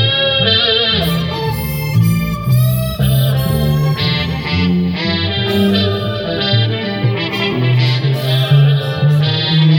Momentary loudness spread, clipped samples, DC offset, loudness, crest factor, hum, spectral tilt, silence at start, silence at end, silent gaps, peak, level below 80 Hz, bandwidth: 6 LU; under 0.1%; under 0.1%; -14 LUFS; 12 dB; none; -6 dB/octave; 0 s; 0 s; none; 0 dBFS; -34 dBFS; 18.5 kHz